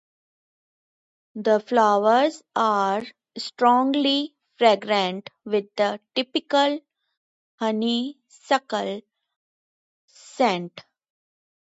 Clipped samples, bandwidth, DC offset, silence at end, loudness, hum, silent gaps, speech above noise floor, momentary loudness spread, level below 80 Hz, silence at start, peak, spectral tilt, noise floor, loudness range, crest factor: under 0.1%; 8 kHz; under 0.1%; 0.8 s; -22 LUFS; none; 7.17-7.58 s, 9.36-10.08 s; over 68 dB; 15 LU; -78 dBFS; 1.35 s; -4 dBFS; -4.5 dB/octave; under -90 dBFS; 7 LU; 20 dB